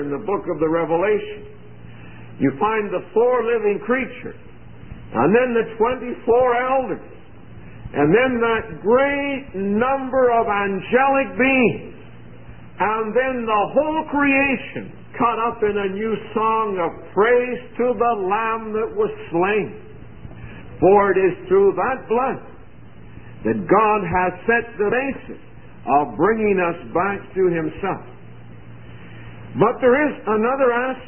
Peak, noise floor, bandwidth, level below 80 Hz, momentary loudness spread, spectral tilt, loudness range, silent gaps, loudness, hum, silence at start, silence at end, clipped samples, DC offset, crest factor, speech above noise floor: -4 dBFS; -43 dBFS; 3.3 kHz; -48 dBFS; 18 LU; -11 dB/octave; 3 LU; none; -19 LUFS; none; 0 s; 0 s; under 0.1%; 0.9%; 16 dB; 24 dB